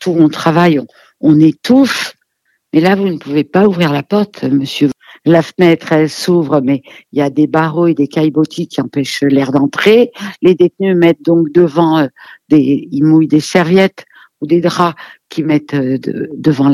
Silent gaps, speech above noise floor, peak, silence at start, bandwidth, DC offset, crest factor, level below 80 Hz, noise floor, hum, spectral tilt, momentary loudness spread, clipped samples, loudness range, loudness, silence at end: none; 52 dB; 0 dBFS; 0 s; 14 kHz; under 0.1%; 12 dB; -58 dBFS; -63 dBFS; none; -6.5 dB/octave; 8 LU; 0.2%; 3 LU; -12 LUFS; 0 s